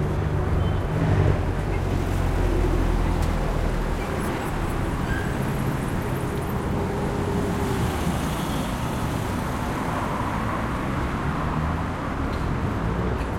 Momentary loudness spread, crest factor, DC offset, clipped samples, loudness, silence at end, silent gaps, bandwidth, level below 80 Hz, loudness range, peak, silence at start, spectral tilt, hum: 3 LU; 14 dB; under 0.1%; under 0.1%; -26 LUFS; 0 s; none; 16.5 kHz; -30 dBFS; 2 LU; -8 dBFS; 0 s; -6.5 dB/octave; none